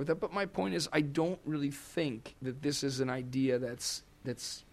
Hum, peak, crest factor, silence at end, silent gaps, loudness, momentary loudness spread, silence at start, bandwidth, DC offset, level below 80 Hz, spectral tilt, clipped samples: none; -18 dBFS; 18 dB; 0.1 s; none; -35 LUFS; 8 LU; 0 s; 15 kHz; under 0.1%; -64 dBFS; -4.5 dB/octave; under 0.1%